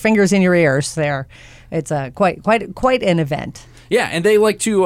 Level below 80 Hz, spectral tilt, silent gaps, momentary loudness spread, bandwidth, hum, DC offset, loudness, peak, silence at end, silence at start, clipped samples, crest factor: -44 dBFS; -5.5 dB/octave; none; 12 LU; 16 kHz; none; under 0.1%; -17 LUFS; -4 dBFS; 0 s; 0 s; under 0.1%; 12 dB